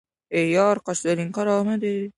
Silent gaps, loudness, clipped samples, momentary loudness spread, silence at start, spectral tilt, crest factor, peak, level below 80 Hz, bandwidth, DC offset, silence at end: none; -22 LUFS; under 0.1%; 6 LU; 0.3 s; -5.5 dB/octave; 16 dB; -8 dBFS; -68 dBFS; 11.5 kHz; under 0.1%; 0.05 s